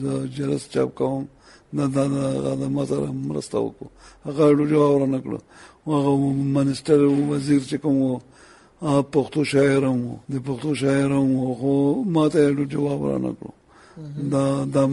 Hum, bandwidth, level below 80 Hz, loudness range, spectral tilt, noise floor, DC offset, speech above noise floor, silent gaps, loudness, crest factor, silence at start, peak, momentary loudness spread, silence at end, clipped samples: none; 11.5 kHz; -56 dBFS; 4 LU; -7.5 dB/octave; -49 dBFS; under 0.1%; 28 dB; none; -22 LUFS; 16 dB; 0 s; -4 dBFS; 13 LU; 0 s; under 0.1%